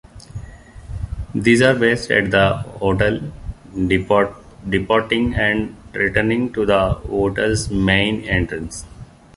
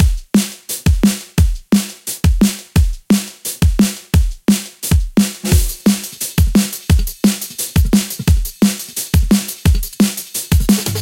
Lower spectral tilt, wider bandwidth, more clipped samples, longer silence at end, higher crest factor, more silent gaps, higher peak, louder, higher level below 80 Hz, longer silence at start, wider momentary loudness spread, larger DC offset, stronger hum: about the same, -5.5 dB/octave vs -5 dB/octave; second, 11.5 kHz vs 17 kHz; neither; first, 0.3 s vs 0 s; about the same, 18 dB vs 14 dB; neither; about the same, -2 dBFS vs 0 dBFS; about the same, -18 LUFS vs -16 LUFS; second, -34 dBFS vs -20 dBFS; first, 0.15 s vs 0 s; first, 17 LU vs 4 LU; neither; neither